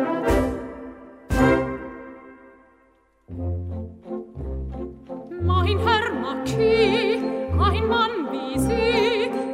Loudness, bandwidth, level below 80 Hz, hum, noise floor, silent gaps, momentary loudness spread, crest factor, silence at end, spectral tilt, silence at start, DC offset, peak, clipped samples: -22 LUFS; 15.5 kHz; -36 dBFS; none; -60 dBFS; none; 16 LU; 18 dB; 0 s; -6 dB/octave; 0 s; under 0.1%; -6 dBFS; under 0.1%